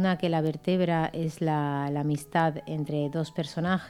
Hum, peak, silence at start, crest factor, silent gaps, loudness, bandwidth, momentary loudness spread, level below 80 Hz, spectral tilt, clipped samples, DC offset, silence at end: none; -10 dBFS; 0 s; 18 dB; none; -28 LUFS; 13.5 kHz; 6 LU; -60 dBFS; -7 dB/octave; under 0.1%; under 0.1%; 0 s